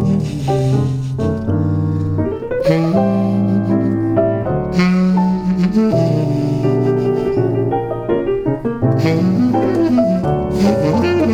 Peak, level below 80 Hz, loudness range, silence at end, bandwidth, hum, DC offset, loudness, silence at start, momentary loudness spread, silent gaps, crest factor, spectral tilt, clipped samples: 0 dBFS; -38 dBFS; 1 LU; 0 s; 9.6 kHz; none; under 0.1%; -16 LUFS; 0 s; 5 LU; none; 14 dB; -8.5 dB/octave; under 0.1%